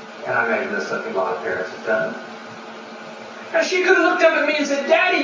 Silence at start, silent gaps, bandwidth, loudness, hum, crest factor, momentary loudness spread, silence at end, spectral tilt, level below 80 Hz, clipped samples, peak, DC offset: 0 s; none; 7.6 kHz; -19 LUFS; none; 18 dB; 20 LU; 0 s; -3 dB/octave; -70 dBFS; under 0.1%; -2 dBFS; under 0.1%